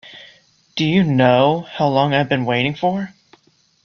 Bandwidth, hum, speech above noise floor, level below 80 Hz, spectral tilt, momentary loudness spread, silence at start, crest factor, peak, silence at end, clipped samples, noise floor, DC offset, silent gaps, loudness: 6.8 kHz; none; 41 dB; -56 dBFS; -7 dB/octave; 10 LU; 0.05 s; 16 dB; -2 dBFS; 0.75 s; under 0.1%; -57 dBFS; under 0.1%; none; -17 LUFS